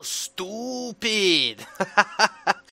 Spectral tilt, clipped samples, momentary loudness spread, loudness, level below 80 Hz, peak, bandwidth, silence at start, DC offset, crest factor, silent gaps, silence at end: -1.5 dB/octave; under 0.1%; 12 LU; -23 LUFS; -68 dBFS; 0 dBFS; 16 kHz; 0 s; under 0.1%; 24 dB; none; 0.15 s